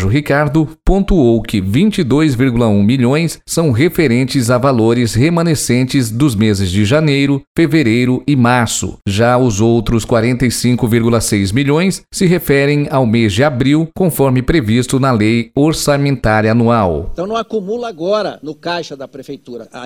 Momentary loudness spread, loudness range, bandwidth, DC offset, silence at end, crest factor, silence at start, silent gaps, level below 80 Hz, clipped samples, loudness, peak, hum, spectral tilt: 8 LU; 2 LU; 17 kHz; under 0.1%; 0 s; 12 dB; 0 s; 7.47-7.55 s; -30 dBFS; under 0.1%; -13 LUFS; 0 dBFS; none; -6 dB/octave